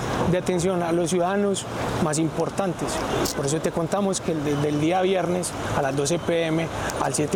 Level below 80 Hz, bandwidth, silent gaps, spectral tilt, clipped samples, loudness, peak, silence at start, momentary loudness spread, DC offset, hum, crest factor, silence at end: -46 dBFS; 19 kHz; none; -5 dB/octave; under 0.1%; -24 LUFS; -10 dBFS; 0 s; 4 LU; under 0.1%; none; 14 dB; 0 s